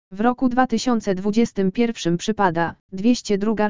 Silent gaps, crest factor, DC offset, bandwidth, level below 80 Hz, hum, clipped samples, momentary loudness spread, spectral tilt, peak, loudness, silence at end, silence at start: 2.80-2.89 s; 18 dB; 2%; 7.6 kHz; -50 dBFS; none; under 0.1%; 4 LU; -5.5 dB/octave; -2 dBFS; -21 LUFS; 0 s; 0.1 s